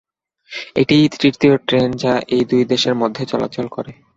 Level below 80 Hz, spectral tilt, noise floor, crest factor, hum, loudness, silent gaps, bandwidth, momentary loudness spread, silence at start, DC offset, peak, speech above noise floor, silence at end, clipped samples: -52 dBFS; -6 dB/octave; -43 dBFS; 16 dB; none; -16 LUFS; none; 8 kHz; 12 LU; 0.5 s; under 0.1%; -2 dBFS; 27 dB; 0.25 s; under 0.1%